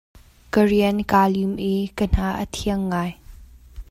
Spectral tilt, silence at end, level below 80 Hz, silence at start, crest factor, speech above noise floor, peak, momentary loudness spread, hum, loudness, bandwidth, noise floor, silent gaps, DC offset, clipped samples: -6.5 dB/octave; 0.1 s; -34 dBFS; 0.55 s; 18 dB; 23 dB; -4 dBFS; 8 LU; none; -21 LUFS; 15.5 kHz; -43 dBFS; none; under 0.1%; under 0.1%